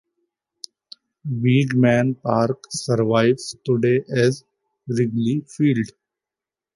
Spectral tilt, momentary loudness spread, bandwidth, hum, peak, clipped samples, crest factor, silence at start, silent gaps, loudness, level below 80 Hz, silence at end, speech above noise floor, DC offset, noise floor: -6.5 dB/octave; 16 LU; 11.5 kHz; none; -4 dBFS; under 0.1%; 18 dB; 1.25 s; none; -20 LUFS; -62 dBFS; 0.9 s; 70 dB; under 0.1%; -89 dBFS